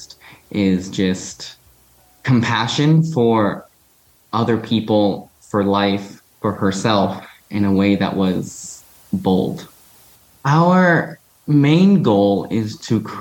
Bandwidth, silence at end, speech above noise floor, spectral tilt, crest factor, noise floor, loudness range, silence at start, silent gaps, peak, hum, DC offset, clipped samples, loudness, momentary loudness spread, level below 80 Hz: 18 kHz; 0 s; 38 dB; -6.5 dB/octave; 16 dB; -55 dBFS; 4 LU; 0 s; none; -2 dBFS; none; under 0.1%; under 0.1%; -17 LUFS; 17 LU; -56 dBFS